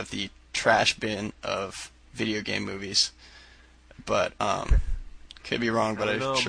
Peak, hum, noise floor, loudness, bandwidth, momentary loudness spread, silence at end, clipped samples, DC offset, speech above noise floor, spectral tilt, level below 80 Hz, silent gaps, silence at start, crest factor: -8 dBFS; none; -53 dBFS; -27 LUFS; 10.5 kHz; 15 LU; 0 s; under 0.1%; under 0.1%; 27 dB; -3.5 dB/octave; -36 dBFS; none; 0 s; 20 dB